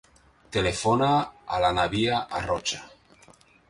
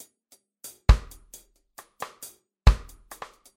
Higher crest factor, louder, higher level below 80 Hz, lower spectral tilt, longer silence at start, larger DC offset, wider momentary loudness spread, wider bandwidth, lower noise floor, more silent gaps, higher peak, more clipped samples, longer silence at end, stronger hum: second, 16 dB vs 22 dB; about the same, -25 LUFS vs -25 LUFS; second, -48 dBFS vs -28 dBFS; about the same, -4.5 dB/octave vs -5.5 dB/octave; second, 0.5 s vs 0.9 s; neither; second, 9 LU vs 23 LU; second, 11.5 kHz vs 16.5 kHz; second, -56 dBFS vs -63 dBFS; neither; second, -10 dBFS vs -4 dBFS; neither; about the same, 0.8 s vs 0.8 s; neither